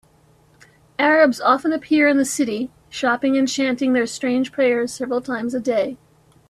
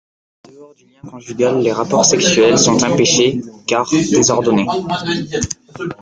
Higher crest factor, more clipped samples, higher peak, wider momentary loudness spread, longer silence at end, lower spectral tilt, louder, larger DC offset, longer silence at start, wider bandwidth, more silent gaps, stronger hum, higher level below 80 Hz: about the same, 16 dB vs 16 dB; neither; second, -4 dBFS vs 0 dBFS; second, 9 LU vs 13 LU; first, 0.55 s vs 0.1 s; about the same, -3.5 dB/octave vs -3.5 dB/octave; second, -19 LUFS vs -14 LUFS; neither; first, 1 s vs 0.6 s; first, 13.5 kHz vs 10 kHz; neither; neither; second, -62 dBFS vs -50 dBFS